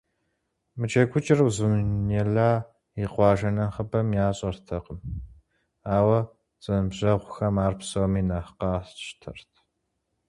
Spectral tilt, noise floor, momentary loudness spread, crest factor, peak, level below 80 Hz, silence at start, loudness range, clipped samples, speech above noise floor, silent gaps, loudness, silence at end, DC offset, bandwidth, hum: -7 dB/octave; -77 dBFS; 16 LU; 20 dB; -6 dBFS; -44 dBFS; 0.75 s; 4 LU; under 0.1%; 53 dB; none; -25 LUFS; 0.9 s; under 0.1%; 11.5 kHz; none